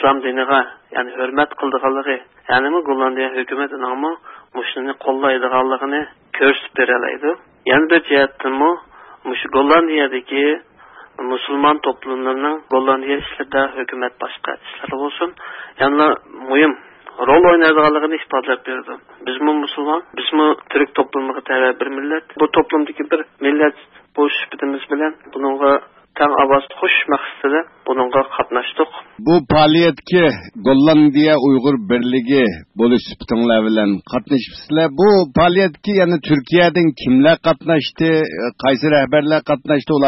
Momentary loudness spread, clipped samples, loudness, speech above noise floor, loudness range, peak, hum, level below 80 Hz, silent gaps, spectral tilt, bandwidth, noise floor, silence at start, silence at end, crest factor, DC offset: 11 LU; under 0.1%; -16 LUFS; 24 dB; 5 LU; 0 dBFS; none; -50 dBFS; none; -9 dB/octave; 6 kHz; -40 dBFS; 0 s; 0 s; 16 dB; under 0.1%